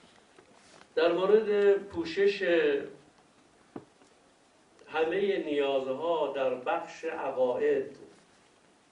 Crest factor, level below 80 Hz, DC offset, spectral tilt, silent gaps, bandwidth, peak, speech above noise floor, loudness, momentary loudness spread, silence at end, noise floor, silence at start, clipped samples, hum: 18 dB; -72 dBFS; under 0.1%; -5.5 dB/octave; none; 9.6 kHz; -12 dBFS; 35 dB; -29 LUFS; 13 LU; 0.85 s; -63 dBFS; 0.95 s; under 0.1%; none